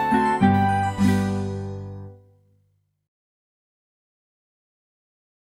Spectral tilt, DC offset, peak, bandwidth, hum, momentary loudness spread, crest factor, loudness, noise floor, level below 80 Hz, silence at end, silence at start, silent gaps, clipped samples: -7 dB/octave; under 0.1%; -6 dBFS; 15 kHz; 50 Hz at -55 dBFS; 17 LU; 20 dB; -21 LUFS; -67 dBFS; -52 dBFS; 3.3 s; 0 s; none; under 0.1%